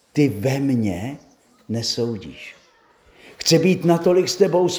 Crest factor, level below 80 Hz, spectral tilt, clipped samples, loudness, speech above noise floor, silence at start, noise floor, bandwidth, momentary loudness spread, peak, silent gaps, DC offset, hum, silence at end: 18 dB; -58 dBFS; -5.5 dB/octave; under 0.1%; -20 LUFS; 36 dB; 0.15 s; -55 dBFS; over 20 kHz; 18 LU; -4 dBFS; none; under 0.1%; none; 0 s